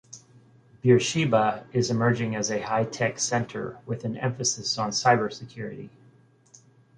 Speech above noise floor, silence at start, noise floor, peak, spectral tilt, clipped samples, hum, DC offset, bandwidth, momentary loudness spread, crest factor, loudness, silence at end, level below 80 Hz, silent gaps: 32 dB; 0.1 s; -58 dBFS; -6 dBFS; -4.5 dB/octave; under 0.1%; none; under 0.1%; 10.5 kHz; 15 LU; 20 dB; -25 LUFS; 1.1 s; -62 dBFS; none